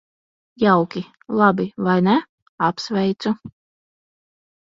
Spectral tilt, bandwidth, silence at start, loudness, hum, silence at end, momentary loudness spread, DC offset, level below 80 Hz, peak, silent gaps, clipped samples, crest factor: -7 dB/octave; 7.4 kHz; 0.6 s; -20 LUFS; none; 1.2 s; 9 LU; under 0.1%; -62 dBFS; -2 dBFS; 2.29-2.58 s; under 0.1%; 20 dB